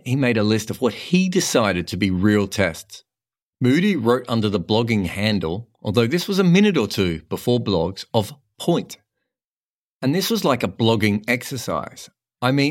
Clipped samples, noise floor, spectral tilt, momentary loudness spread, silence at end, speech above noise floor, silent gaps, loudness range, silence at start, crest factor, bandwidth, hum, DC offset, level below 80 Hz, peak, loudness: under 0.1%; under -90 dBFS; -5.5 dB/octave; 8 LU; 0 s; over 70 dB; 3.42-3.53 s, 9.44-10.00 s; 4 LU; 0.05 s; 20 dB; 16.5 kHz; none; under 0.1%; -52 dBFS; -2 dBFS; -20 LUFS